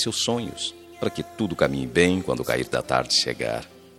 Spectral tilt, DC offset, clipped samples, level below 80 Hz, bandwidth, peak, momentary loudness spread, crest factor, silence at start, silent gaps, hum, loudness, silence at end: -3.5 dB/octave; under 0.1%; under 0.1%; -50 dBFS; 16 kHz; -4 dBFS; 10 LU; 22 dB; 0 s; none; none; -24 LUFS; 0.2 s